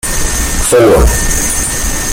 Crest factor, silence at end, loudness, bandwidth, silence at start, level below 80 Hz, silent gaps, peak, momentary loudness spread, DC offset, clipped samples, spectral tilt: 10 dB; 0 s; -10 LUFS; 17 kHz; 0.05 s; -16 dBFS; none; 0 dBFS; 7 LU; under 0.1%; under 0.1%; -3.5 dB/octave